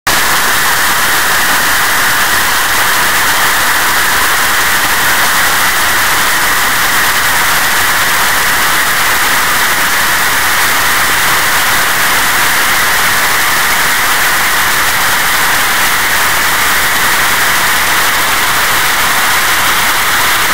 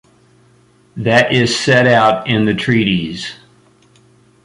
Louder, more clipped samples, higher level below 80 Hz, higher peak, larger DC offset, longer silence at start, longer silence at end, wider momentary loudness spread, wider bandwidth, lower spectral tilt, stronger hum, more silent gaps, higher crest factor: first, -8 LUFS vs -13 LUFS; neither; first, -34 dBFS vs -48 dBFS; about the same, 0 dBFS vs 0 dBFS; first, 10% vs under 0.1%; second, 0.05 s vs 0.95 s; second, 0 s vs 1.1 s; second, 1 LU vs 14 LU; first, 16 kHz vs 11.5 kHz; second, 0 dB/octave vs -5 dB/octave; neither; neither; second, 10 dB vs 16 dB